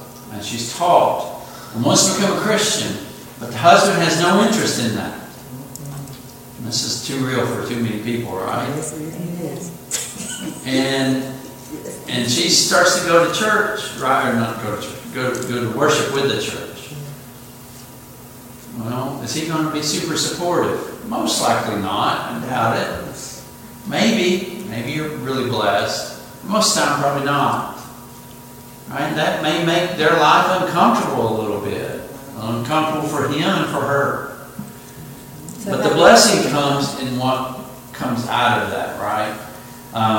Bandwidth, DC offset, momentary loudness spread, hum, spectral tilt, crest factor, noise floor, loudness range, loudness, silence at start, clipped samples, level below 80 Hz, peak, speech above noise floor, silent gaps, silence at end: 17 kHz; under 0.1%; 21 LU; none; -3.5 dB/octave; 20 dB; -39 dBFS; 7 LU; -18 LUFS; 0 s; under 0.1%; -54 dBFS; 0 dBFS; 21 dB; none; 0 s